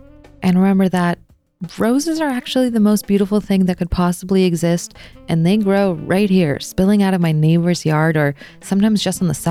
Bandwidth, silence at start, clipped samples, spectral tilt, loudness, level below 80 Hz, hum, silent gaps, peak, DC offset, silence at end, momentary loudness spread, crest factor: 14.5 kHz; 0.4 s; under 0.1%; -6.5 dB/octave; -16 LUFS; -40 dBFS; none; none; -4 dBFS; under 0.1%; 0 s; 7 LU; 12 dB